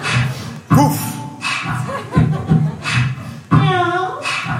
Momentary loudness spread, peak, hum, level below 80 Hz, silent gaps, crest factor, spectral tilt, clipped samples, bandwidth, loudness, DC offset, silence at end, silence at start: 9 LU; 0 dBFS; none; -40 dBFS; none; 16 dB; -5.5 dB/octave; under 0.1%; 16 kHz; -17 LUFS; under 0.1%; 0 s; 0 s